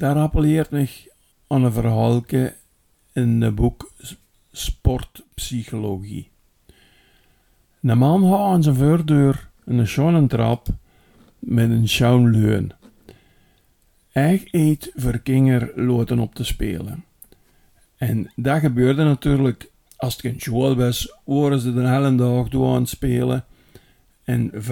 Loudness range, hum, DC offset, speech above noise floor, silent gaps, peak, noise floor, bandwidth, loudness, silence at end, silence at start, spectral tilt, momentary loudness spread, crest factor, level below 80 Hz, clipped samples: 6 LU; none; under 0.1%; 42 dB; none; -2 dBFS; -60 dBFS; 17.5 kHz; -20 LUFS; 0 s; 0 s; -7 dB/octave; 14 LU; 18 dB; -36 dBFS; under 0.1%